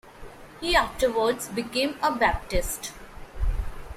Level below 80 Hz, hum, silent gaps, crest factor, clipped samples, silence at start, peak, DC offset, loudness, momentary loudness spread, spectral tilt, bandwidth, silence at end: -34 dBFS; none; none; 20 dB; under 0.1%; 0.05 s; -8 dBFS; under 0.1%; -26 LUFS; 22 LU; -3.5 dB/octave; 16 kHz; 0 s